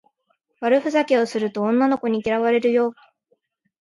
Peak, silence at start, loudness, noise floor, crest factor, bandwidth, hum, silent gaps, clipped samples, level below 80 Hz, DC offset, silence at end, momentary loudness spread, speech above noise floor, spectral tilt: -6 dBFS; 0.6 s; -20 LUFS; -70 dBFS; 16 dB; 11.5 kHz; none; none; under 0.1%; -64 dBFS; under 0.1%; 0.9 s; 5 LU; 50 dB; -5.5 dB/octave